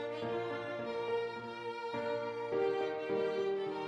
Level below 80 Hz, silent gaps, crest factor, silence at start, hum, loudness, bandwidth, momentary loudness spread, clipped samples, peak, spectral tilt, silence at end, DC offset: -80 dBFS; none; 14 dB; 0 s; none; -37 LUFS; 9.2 kHz; 6 LU; under 0.1%; -24 dBFS; -6 dB/octave; 0 s; under 0.1%